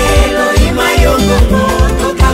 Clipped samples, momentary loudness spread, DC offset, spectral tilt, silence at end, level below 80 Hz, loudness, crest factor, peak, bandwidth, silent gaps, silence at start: 0.5%; 2 LU; under 0.1%; -5 dB/octave; 0 s; -12 dBFS; -10 LUFS; 8 dB; 0 dBFS; 16 kHz; none; 0 s